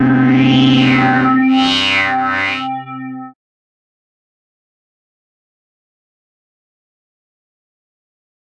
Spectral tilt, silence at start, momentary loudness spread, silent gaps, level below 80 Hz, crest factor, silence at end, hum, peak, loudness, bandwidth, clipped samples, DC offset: -5.5 dB/octave; 0 s; 17 LU; none; -52 dBFS; 14 dB; 5.2 s; none; -2 dBFS; -12 LUFS; 8.8 kHz; under 0.1%; under 0.1%